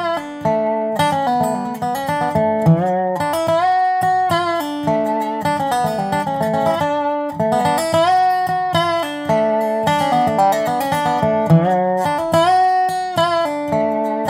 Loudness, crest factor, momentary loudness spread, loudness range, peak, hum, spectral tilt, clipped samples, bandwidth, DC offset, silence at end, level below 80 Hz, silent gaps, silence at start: -17 LUFS; 14 dB; 6 LU; 2 LU; -2 dBFS; none; -6 dB/octave; under 0.1%; 16 kHz; under 0.1%; 0 s; -54 dBFS; none; 0 s